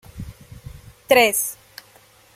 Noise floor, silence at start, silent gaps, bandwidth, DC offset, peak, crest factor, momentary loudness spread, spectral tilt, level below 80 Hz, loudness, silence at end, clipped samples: -52 dBFS; 0.15 s; none; 16.5 kHz; under 0.1%; -2 dBFS; 22 dB; 26 LU; -2 dB/octave; -48 dBFS; -17 LUFS; 0.8 s; under 0.1%